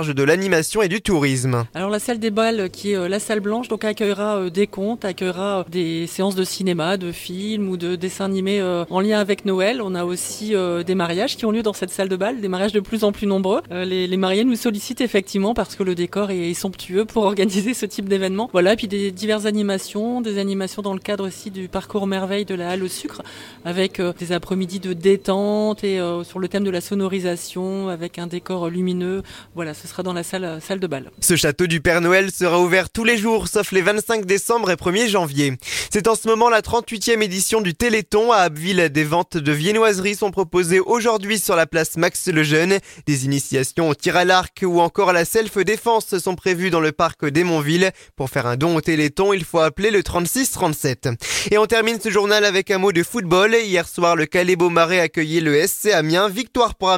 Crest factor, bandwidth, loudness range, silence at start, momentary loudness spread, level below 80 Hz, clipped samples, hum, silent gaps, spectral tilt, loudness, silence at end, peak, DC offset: 18 dB; 17 kHz; 6 LU; 0 s; 9 LU; -48 dBFS; under 0.1%; none; none; -4.5 dB/octave; -19 LUFS; 0 s; 0 dBFS; under 0.1%